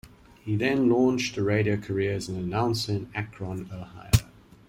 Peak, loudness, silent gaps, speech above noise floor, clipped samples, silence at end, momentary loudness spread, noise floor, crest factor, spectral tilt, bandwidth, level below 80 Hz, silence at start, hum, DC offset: -4 dBFS; -27 LUFS; none; 20 dB; under 0.1%; 0.45 s; 13 LU; -46 dBFS; 22 dB; -6 dB/octave; 16.5 kHz; -44 dBFS; 0.05 s; none; under 0.1%